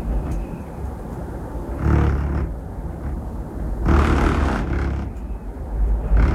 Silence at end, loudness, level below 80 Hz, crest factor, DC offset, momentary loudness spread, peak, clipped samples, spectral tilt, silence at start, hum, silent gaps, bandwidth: 0 s; -24 LUFS; -24 dBFS; 16 dB; under 0.1%; 13 LU; -4 dBFS; under 0.1%; -8 dB/octave; 0 s; none; none; 10.5 kHz